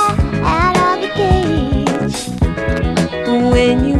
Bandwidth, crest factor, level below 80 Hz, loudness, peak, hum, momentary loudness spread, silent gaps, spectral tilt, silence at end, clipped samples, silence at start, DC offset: 13.5 kHz; 14 dB; -24 dBFS; -15 LUFS; 0 dBFS; none; 6 LU; none; -6 dB/octave; 0 s; under 0.1%; 0 s; under 0.1%